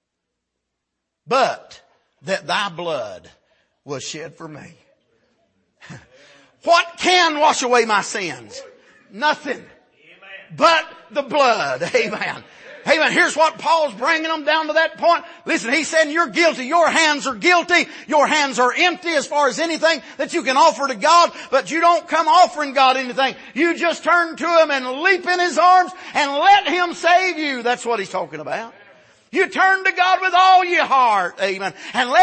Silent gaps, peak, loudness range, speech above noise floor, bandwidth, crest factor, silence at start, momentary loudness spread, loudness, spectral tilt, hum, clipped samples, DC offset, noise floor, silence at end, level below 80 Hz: none; -2 dBFS; 8 LU; 61 dB; 8.8 kHz; 16 dB; 1.3 s; 13 LU; -17 LUFS; -2 dB/octave; none; under 0.1%; under 0.1%; -78 dBFS; 0 s; -68 dBFS